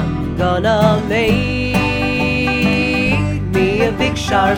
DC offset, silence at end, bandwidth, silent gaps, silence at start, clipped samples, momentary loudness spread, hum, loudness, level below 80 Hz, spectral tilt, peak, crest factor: under 0.1%; 0 s; 19.5 kHz; none; 0 s; under 0.1%; 4 LU; none; -15 LUFS; -30 dBFS; -6 dB/octave; 0 dBFS; 14 dB